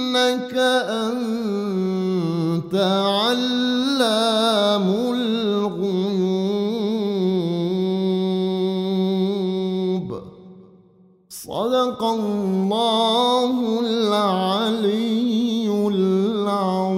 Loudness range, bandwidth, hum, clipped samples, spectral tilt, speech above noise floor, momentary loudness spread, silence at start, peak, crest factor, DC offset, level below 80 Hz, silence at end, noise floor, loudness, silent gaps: 5 LU; 16 kHz; none; under 0.1%; -5.5 dB/octave; 34 dB; 5 LU; 0 s; -6 dBFS; 14 dB; under 0.1%; -62 dBFS; 0 s; -53 dBFS; -21 LUFS; none